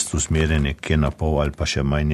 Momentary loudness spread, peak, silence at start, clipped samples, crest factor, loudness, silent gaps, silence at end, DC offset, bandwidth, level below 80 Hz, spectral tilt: 3 LU; -6 dBFS; 0 s; under 0.1%; 16 dB; -21 LUFS; none; 0 s; under 0.1%; 12.5 kHz; -28 dBFS; -5 dB/octave